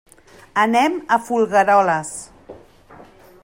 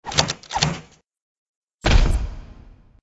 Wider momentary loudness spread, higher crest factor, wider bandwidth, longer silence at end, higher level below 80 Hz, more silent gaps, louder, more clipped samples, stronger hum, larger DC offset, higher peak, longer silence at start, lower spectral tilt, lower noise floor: about the same, 17 LU vs 15 LU; second, 16 dB vs 22 dB; first, 16 kHz vs 11 kHz; first, 0.5 s vs 0.35 s; second, -58 dBFS vs -24 dBFS; second, none vs 1.22-1.68 s, 1.74-1.78 s; first, -17 LUFS vs -22 LUFS; neither; neither; neither; second, -4 dBFS vs 0 dBFS; first, 0.55 s vs 0.05 s; about the same, -4 dB/octave vs -3.5 dB/octave; about the same, -45 dBFS vs -46 dBFS